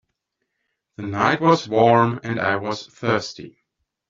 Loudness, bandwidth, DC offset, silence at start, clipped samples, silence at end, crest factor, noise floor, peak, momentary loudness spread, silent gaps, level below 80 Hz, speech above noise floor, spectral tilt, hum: -20 LUFS; 7.6 kHz; under 0.1%; 1 s; under 0.1%; 0.6 s; 20 dB; -77 dBFS; -2 dBFS; 15 LU; none; -60 dBFS; 58 dB; -4.5 dB/octave; none